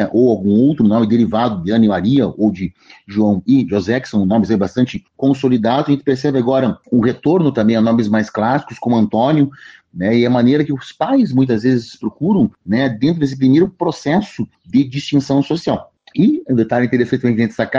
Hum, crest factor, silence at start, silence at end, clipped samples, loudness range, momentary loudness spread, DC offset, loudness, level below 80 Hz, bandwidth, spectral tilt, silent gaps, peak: none; 12 dB; 0 s; 0 s; under 0.1%; 2 LU; 6 LU; under 0.1%; -15 LUFS; -50 dBFS; 7.6 kHz; -8 dB/octave; none; -4 dBFS